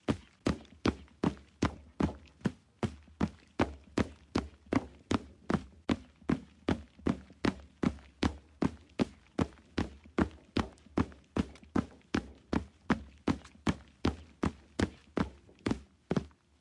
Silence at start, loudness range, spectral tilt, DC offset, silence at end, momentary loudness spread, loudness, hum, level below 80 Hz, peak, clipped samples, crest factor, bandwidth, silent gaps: 0.1 s; 1 LU; -6.5 dB/octave; under 0.1%; 0.35 s; 3 LU; -37 LUFS; none; -50 dBFS; -10 dBFS; under 0.1%; 26 dB; 11.5 kHz; none